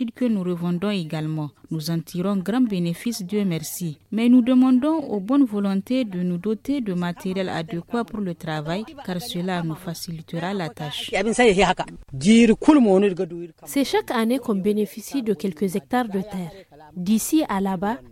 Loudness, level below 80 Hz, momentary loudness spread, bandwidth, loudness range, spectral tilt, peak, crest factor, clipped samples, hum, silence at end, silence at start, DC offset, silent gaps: -22 LUFS; -52 dBFS; 13 LU; 16.5 kHz; 8 LU; -5.5 dB/octave; -4 dBFS; 18 dB; under 0.1%; none; 0 s; 0 s; under 0.1%; none